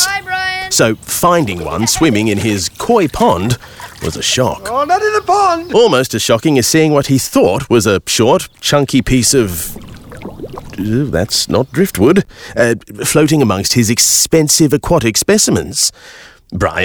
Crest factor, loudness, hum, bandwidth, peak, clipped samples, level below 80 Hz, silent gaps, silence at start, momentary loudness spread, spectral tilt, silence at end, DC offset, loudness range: 12 dB; -12 LUFS; none; over 20 kHz; 0 dBFS; under 0.1%; -36 dBFS; none; 0 s; 9 LU; -4 dB/octave; 0 s; under 0.1%; 4 LU